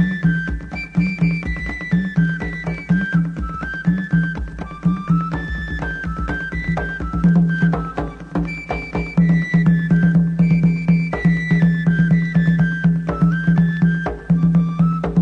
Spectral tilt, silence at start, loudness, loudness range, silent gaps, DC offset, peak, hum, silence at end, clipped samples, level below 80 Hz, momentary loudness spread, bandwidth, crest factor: -9 dB/octave; 0 s; -18 LUFS; 5 LU; none; under 0.1%; -4 dBFS; none; 0 s; under 0.1%; -32 dBFS; 9 LU; 5 kHz; 14 dB